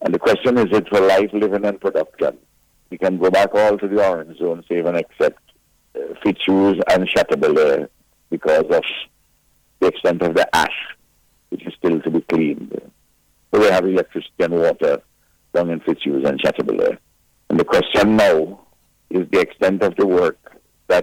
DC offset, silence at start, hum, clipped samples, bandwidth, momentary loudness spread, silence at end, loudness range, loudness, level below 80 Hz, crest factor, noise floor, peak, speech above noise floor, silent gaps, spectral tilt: under 0.1%; 0 s; none; under 0.1%; 16.5 kHz; 13 LU; 0 s; 3 LU; -18 LUFS; -52 dBFS; 12 dB; -60 dBFS; -6 dBFS; 43 dB; none; -5.5 dB/octave